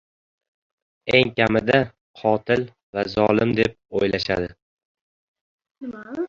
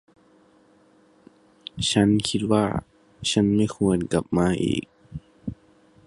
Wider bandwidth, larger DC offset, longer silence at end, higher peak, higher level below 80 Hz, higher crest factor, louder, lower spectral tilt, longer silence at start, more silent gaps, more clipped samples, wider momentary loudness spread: second, 7.8 kHz vs 11.5 kHz; neither; second, 0 s vs 0.55 s; about the same, -2 dBFS vs -4 dBFS; about the same, -50 dBFS vs -48 dBFS; about the same, 22 dB vs 20 dB; about the same, -21 LUFS vs -23 LUFS; about the same, -6.5 dB/octave vs -5.5 dB/octave; second, 1.05 s vs 1.75 s; first, 2.01-2.14 s, 2.83-2.93 s, 4.62-4.77 s, 4.85-4.95 s, 5.01-5.35 s, 5.41-5.59 s, 5.71-5.75 s vs none; neither; second, 15 LU vs 20 LU